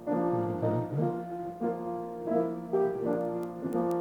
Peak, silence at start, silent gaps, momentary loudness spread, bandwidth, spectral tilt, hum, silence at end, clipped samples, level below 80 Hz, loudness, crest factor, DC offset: -16 dBFS; 0 s; none; 6 LU; 19 kHz; -9.5 dB/octave; none; 0 s; under 0.1%; -66 dBFS; -32 LUFS; 14 dB; under 0.1%